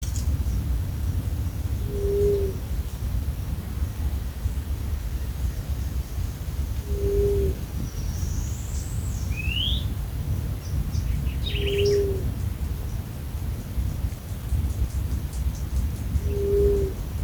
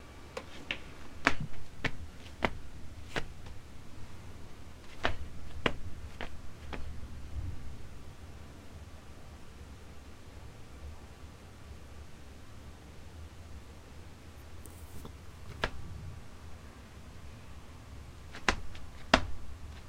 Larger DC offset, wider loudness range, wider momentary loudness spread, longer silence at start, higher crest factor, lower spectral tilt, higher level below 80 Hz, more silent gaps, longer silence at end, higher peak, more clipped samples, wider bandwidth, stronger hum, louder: neither; second, 3 LU vs 13 LU; second, 8 LU vs 18 LU; about the same, 0 s vs 0 s; second, 18 dB vs 34 dB; first, -6 dB/octave vs -4.5 dB/octave; first, -30 dBFS vs -48 dBFS; neither; about the same, 0 s vs 0 s; second, -8 dBFS vs -2 dBFS; neither; first, over 20 kHz vs 16 kHz; neither; first, -28 LUFS vs -39 LUFS